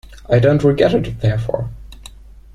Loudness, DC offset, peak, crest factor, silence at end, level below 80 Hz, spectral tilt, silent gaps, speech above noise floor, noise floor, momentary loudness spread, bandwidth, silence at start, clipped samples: -16 LUFS; under 0.1%; -2 dBFS; 16 dB; 0.3 s; -36 dBFS; -8 dB/octave; none; 24 dB; -39 dBFS; 13 LU; 11.5 kHz; 0.1 s; under 0.1%